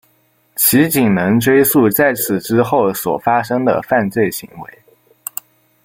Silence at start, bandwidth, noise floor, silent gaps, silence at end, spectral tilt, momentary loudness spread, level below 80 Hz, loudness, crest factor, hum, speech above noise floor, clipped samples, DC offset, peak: 0.55 s; 17 kHz; -58 dBFS; none; 1.2 s; -5 dB/octave; 16 LU; -52 dBFS; -14 LUFS; 16 dB; none; 43 dB; under 0.1%; under 0.1%; 0 dBFS